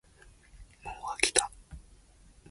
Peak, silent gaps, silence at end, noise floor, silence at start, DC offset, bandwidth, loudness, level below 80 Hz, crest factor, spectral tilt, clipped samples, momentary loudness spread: -4 dBFS; none; 0.7 s; -58 dBFS; 0.25 s; under 0.1%; 12 kHz; -29 LUFS; -54 dBFS; 32 dB; -0.5 dB/octave; under 0.1%; 27 LU